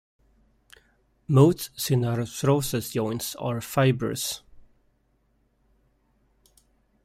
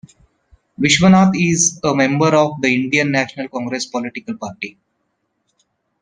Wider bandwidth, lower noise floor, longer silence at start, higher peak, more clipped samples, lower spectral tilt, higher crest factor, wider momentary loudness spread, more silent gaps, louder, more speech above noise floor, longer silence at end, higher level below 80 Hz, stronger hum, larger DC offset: first, 16 kHz vs 10.5 kHz; about the same, -68 dBFS vs -70 dBFS; first, 1.3 s vs 0.8 s; second, -6 dBFS vs 0 dBFS; neither; first, -6 dB/octave vs -4 dB/octave; about the same, 22 dB vs 18 dB; second, 11 LU vs 16 LU; neither; second, -25 LUFS vs -15 LUFS; second, 44 dB vs 54 dB; first, 2.45 s vs 1.3 s; about the same, -56 dBFS vs -52 dBFS; neither; neither